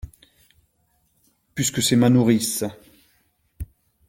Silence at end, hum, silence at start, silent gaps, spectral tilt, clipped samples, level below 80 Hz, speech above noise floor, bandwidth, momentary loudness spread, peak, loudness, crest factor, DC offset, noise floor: 0.45 s; none; 0.05 s; none; -4.5 dB/octave; under 0.1%; -48 dBFS; 48 dB; 16.5 kHz; 23 LU; -4 dBFS; -20 LUFS; 20 dB; under 0.1%; -67 dBFS